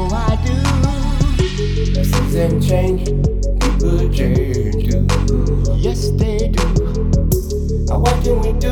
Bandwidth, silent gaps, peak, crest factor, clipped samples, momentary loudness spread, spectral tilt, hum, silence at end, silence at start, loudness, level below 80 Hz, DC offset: 17.5 kHz; none; -2 dBFS; 14 dB; under 0.1%; 3 LU; -6.5 dB/octave; none; 0 s; 0 s; -17 LUFS; -18 dBFS; under 0.1%